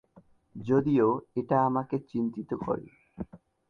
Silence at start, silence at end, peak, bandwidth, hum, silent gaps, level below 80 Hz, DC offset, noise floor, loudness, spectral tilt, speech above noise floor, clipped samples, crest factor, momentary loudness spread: 0.55 s; 0.35 s; -12 dBFS; 6.6 kHz; none; none; -60 dBFS; under 0.1%; -60 dBFS; -28 LUFS; -10 dB/octave; 32 dB; under 0.1%; 18 dB; 18 LU